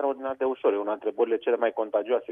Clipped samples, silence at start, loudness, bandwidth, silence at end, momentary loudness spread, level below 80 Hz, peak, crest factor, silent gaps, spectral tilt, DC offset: under 0.1%; 0 s; -27 LUFS; 3.7 kHz; 0 s; 4 LU; -74 dBFS; -12 dBFS; 14 dB; none; -7 dB/octave; under 0.1%